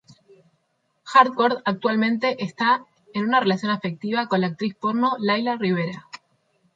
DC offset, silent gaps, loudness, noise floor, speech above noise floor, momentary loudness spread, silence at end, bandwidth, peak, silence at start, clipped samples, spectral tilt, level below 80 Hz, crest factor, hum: under 0.1%; none; -22 LUFS; -71 dBFS; 49 dB; 9 LU; 0.6 s; 7.8 kHz; -2 dBFS; 1.05 s; under 0.1%; -6.5 dB/octave; -70 dBFS; 20 dB; none